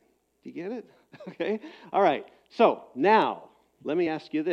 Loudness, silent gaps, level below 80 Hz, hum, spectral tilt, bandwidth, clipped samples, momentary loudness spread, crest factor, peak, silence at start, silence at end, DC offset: -26 LUFS; none; -78 dBFS; none; -7 dB/octave; 7.6 kHz; under 0.1%; 19 LU; 20 dB; -6 dBFS; 0.45 s; 0 s; under 0.1%